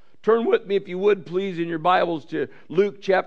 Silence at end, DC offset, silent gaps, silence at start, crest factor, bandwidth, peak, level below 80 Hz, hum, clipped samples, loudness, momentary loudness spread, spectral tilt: 0 s; 0.7%; none; 0.25 s; 16 dB; 6.8 kHz; -6 dBFS; -74 dBFS; none; under 0.1%; -23 LUFS; 7 LU; -7 dB/octave